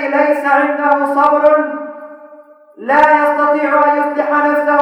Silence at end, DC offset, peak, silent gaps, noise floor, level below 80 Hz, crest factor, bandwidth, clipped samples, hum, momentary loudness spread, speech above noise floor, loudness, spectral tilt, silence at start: 0 s; under 0.1%; 0 dBFS; none; -41 dBFS; -60 dBFS; 12 dB; 12.5 kHz; under 0.1%; none; 12 LU; 29 dB; -12 LUFS; -4.5 dB/octave; 0 s